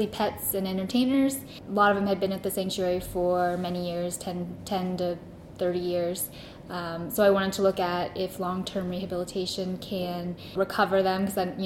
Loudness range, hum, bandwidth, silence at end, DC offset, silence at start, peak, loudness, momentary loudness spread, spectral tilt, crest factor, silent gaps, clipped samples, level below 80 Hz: 4 LU; none; 16.5 kHz; 0 s; under 0.1%; 0 s; -8 dBFS; -28 LUFS; 11 LU; -5 dB/octave; 20 dB; none; under 0.1%; -54 dBFS